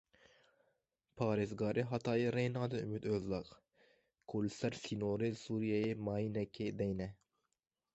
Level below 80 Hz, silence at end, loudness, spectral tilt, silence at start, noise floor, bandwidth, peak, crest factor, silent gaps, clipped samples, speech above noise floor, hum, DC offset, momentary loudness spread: -66 dBFS; 0.8 s; -39 LUFS; -7 dB/octave; 1.15 s; -82 dBFS; 8.2 kHz; -20 dBFS; 18 dB; none; under 0.1%; 45 dB; none; under 0.1%; 6 LU